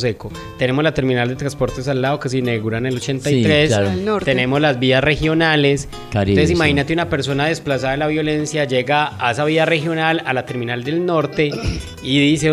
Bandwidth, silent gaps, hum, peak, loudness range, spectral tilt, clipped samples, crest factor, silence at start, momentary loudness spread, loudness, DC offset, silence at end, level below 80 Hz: 14 kHz; none; none; -2 dBFS; 2 LU; -5.5 dB/octave; under 0.1%; 16 dB; 0 s; 7 LU; -17 LUFS; under 0.1%; 0 s; -38 dBFS